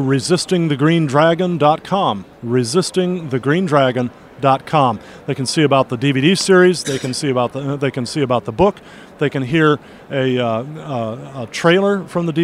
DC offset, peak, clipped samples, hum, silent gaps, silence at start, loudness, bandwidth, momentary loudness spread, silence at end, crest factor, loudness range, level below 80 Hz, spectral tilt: under 0.1%; 0 dBFS; under 0.1%; none; none; 0 s; -17 LUFS; 15 kHz; 10 LU; 0 s; 16 dB; 3 LU; -50 dBFS; -5.5 dB/octave